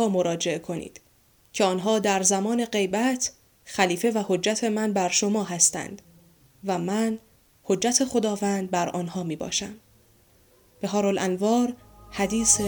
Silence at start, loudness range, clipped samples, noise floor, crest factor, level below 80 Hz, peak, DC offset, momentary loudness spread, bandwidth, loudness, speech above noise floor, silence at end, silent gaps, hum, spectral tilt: 0 s; 4 LU; under 0.1%; -60 dBFS; 22 dB; -58 dBFS; -4 dBFS; under 0.1%; 14 LU; over 20 kHz; -24 LUFS; 36 dB; 0 s; none; none; -3.5 dB/octave